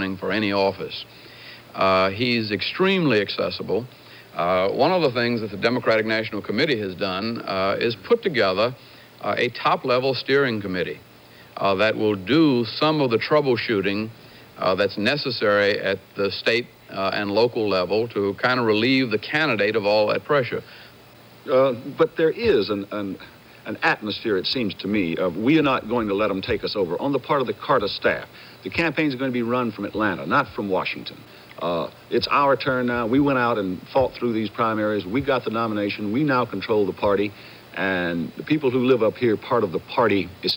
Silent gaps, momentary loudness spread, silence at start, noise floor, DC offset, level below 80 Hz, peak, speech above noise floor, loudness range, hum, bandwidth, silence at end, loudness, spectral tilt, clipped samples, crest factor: none; 9 LU; 0 s; -47 dBFS; under 0.1%; -56 dBFS; -6 dBFS; 26 dB; 2 LU; none; 17 kHz; 0 s; -22 LUFS; -6.5 dB/octave; under 0.1%; 16 dB